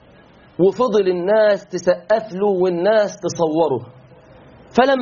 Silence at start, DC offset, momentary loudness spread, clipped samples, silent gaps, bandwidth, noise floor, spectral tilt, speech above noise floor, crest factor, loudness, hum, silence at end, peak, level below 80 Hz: 0.6 s; under 0.1%; 6 LU; under 0.1%; none; 7.2 kHz; -47 dBFS; -4.5 dB/octave; 30 dB; 18 dB; -18 LUFS; none; 0 s; 0 dBFS; -56 dBFS